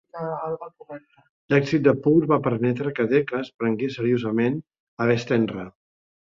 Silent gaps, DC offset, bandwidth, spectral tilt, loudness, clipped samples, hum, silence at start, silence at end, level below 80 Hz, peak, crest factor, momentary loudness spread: 1.29-1.49 s, 3.54-3.59 s, 4.80-4.97 s; under 0.1%; 7.4 kHz; -8 dB/octave; -23 LUFS; under 0.1%; none; 0.15 s; 0.6 s; -62 dBFS; -4 dBFS; 18 dB; 16 LU